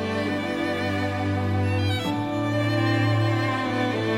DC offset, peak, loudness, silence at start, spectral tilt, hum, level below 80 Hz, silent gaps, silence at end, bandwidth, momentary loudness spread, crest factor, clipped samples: under 0.1%; -10 dBFS; -24 LUFS; 0 s; -6.5 dB/octave; none; -56 dBFS; none; 0 s; 13.5 kHz; 4 LU; 12 dB; under 0.1%